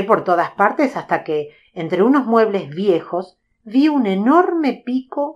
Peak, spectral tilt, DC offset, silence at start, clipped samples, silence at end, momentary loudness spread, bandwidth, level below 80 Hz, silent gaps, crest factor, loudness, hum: 0 dBFS; -7.5 dB/octave; under 0.1%; 0 s; under 0.1%; 0.05 s; 10 LU; 7.8 kHz; -68 dBFS; none; 18 dB; -17 LUFS; none